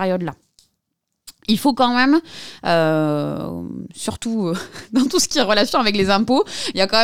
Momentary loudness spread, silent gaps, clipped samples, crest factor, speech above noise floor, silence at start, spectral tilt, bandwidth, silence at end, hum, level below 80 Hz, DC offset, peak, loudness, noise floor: 12 LU; none; under 0.1%; 18 dB; 58 dB; 0 s; -4 dB/octave; 19 kHz; 0 s; none; -50 dBFS; under 0.1%; -2 dBFS; -19 LUFS; -76 dBFS